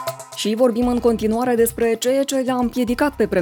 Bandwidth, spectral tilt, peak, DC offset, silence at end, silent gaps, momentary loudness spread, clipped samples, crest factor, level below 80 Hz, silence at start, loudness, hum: 19 kHz; -4.5 dB/octave; -4 dBFS; under 0.1%; 0 s; none; 3 LU; under 0.1%; 14 dB; -42 dBFS; 0 s; -19 LUFS; none